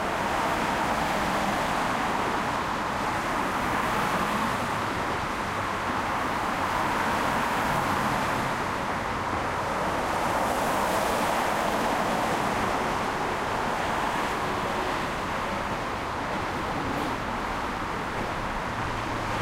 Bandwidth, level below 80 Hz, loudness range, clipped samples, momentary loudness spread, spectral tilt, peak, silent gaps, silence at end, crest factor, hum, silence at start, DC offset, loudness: 16 kHz; -44 dBFS; 3 LU; under 0.1%; 4 LU; -4 dB/octave; -14 dBFS; none; 0 s; 14 dB; none; 0 s; under 0.1%; -27 LUFS